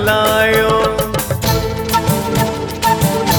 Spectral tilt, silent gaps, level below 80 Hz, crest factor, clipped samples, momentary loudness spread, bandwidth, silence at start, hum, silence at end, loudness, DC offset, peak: -4.5 dB/octave; none; -32 dBFS; 14 dB; under 0.1%; 6 LU; 19.5 kHz; 0 s; none; 0 s; -15 LUFS; under 0.1%; -2 dBFS